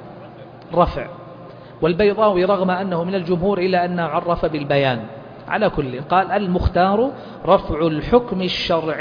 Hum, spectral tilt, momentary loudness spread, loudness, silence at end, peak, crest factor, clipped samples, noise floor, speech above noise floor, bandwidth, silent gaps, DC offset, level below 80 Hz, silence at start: none; -8 dB/octave; 19 LU; -19 LUFS; 0 s; 0 dBFS; 18 dB; under 0.1%; -38 dBFS; 20 dB; 5.2 kHz; none; under 0.1%; -36 dBFS; 0 s